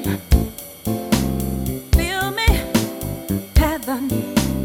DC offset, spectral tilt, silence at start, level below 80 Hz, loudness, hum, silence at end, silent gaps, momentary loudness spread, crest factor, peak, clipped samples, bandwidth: under 0.1%; -5 dB/octave; 0 s; -24 dBFS; -21 LUFS; none; 0 s; none; 7 LU; 18 dB; -2 dBFS; under 0.1%; 17.5 kHz